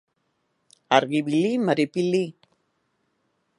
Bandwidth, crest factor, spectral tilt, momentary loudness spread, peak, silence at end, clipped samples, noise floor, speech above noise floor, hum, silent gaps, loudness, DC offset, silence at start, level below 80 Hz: 11.5 kHz; 24 dB; -6 dB/octave; 4 LU; -2 dBFS; 1.25 s; under 0.1%; -73 dBFS; 51 dB; none; none; -23 LUFS; under 0.1%; 0.9 s; -76 dBFS